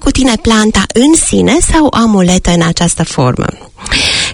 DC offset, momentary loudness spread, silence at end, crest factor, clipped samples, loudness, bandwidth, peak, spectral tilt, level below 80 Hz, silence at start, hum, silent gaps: under 0.1%; 5 LU; 0 s; 10 dB; 0.4%; -9 LUFS; 16.5 kHz; 0 dBFS; -4 dB/octave; -22 dBFS; 0 s; none; none